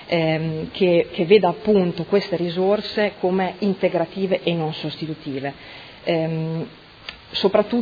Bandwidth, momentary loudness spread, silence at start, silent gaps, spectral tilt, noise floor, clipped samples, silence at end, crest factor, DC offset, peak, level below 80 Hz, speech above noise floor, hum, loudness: 5 kHz; 13 LU; 0 s; none; -8 dB/octave; -40 dBFS; under 0.1%; 0 s; 20 dB; under 0.1%; -2 dBFS; -56 dBFS; 19 dB; none; -21 LUFS